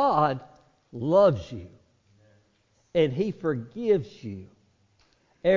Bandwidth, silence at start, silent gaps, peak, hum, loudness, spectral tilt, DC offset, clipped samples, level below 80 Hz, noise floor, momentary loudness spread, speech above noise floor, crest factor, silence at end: 7.4 kHz; 0 s; none; -8 dBFS; none; -25 LUFS; -8 dB/octave; under 0.1%; under 0.1%; -56 dBFS; -67 dBFS; 20 LU; 42 dB; 18 dB; 0 s